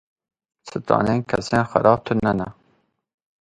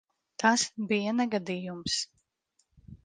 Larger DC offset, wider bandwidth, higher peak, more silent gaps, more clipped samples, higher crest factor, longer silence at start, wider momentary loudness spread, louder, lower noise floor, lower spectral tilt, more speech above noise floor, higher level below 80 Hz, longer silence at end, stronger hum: neither; about the same, 11 kHz vs 10 kHz; first, 0 dBFS vs -8 dBFS; neither; neither; about the same, 22 dB vs 22 dB; first, 0.65 s vs 0.4 s; first, 15 LU vs 10 LU; first, -20 LUFS vs -29 LUFS; second, -65 dBFS vs -75 dBFS; first, -7 dB/octave vs -3 dB/octave; about the same, 45 dB vs 46 dB; first, -50 dBFS vs -64 dBFS; first, 0.9 s vs 0.1 s; neither